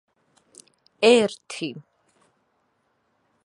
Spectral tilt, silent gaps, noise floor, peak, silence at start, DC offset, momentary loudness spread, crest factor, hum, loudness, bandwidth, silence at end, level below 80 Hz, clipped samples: -3.5 dB/octave; none; -70 dBFS; -4 dBFS; 1 s; under 0.1%; 17 LU; 24 dB; none; -21 LUFS; 11 kHz; 1.65 s; -76 dBFS; under 0.1%